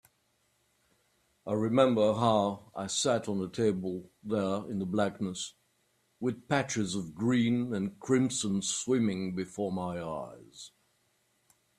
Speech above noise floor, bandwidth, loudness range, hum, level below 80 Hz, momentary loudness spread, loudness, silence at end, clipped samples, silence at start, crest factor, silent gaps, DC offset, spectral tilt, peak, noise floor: 43 dB; 13.5 kHz; 4 LU; none; -68 dBFS; 13 LU; -31 LUFS; 1.1 s; under 0.1%; 1.45 s; 20 dB; none; under 0.1%; -5 dB/octave; -10 dBFS; -74 dBFS